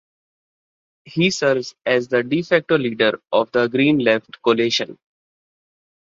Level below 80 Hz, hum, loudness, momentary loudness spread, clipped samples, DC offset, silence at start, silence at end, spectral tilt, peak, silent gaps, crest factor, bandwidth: -62 dBFS; none; -19 LUFS; 4 LU; under 0.1%; under 0.1%; 1.05 s; 1.2 s; -5 dB/octave; -2 dBFS; none; 18 dB; 7.8 kHz